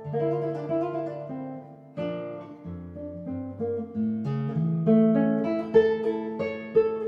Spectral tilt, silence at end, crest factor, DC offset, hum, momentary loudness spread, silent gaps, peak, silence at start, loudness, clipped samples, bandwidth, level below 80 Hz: -10 dB/octave; 0 s; 18 dB; under 0.1%; none; 17 LU; none; -8 dBFS; 0 s; -27 LUFS; under 0.1%; 5.8 kHz; -70 dBFS